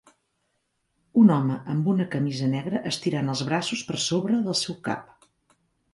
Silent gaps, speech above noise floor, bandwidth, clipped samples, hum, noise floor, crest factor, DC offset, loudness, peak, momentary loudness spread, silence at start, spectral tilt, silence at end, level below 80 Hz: none; 50 dB; 11.5 kHz; under 0.1%; none; -74 dBFS; 18 dB; under 0.1%; -25 LUFS; -6 dBFS; 10 LU; 1.15 s; -5.5 dB/octave; 0.9 s; -66 dBFS